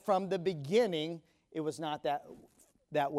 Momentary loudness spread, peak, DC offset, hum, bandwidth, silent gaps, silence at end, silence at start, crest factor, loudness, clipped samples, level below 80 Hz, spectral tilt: 13 LU; -18 dBFS; under 0.1%; none; 15.5 kHz; none; 0 s; 0.05 s; 18 dB; -35 LUFS; under 0.1%; -76 dBFS; -5.5 dB/octave